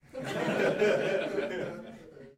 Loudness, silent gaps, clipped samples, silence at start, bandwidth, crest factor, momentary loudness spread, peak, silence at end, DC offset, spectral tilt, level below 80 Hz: -30 LUFS; none; under 0.1%; 0.15 s; 15.5 kHz; 16 dB; 18 LU; -16 dBFS; 0.05 s; under 0.1%; -5.5 dB/octave; -66 dBFS